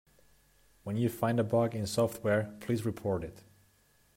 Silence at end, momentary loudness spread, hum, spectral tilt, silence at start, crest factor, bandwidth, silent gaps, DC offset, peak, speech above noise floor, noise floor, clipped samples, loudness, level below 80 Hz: 0.75 s; 8 LU; none; -6.5 dB/octave; 0.85 s; 18 dB; 16 kHz; none; under 0.1%; -16 dBFS; 36 dB; -67 dBFS; under 0.1%; -32 LUFS; -64 dBFS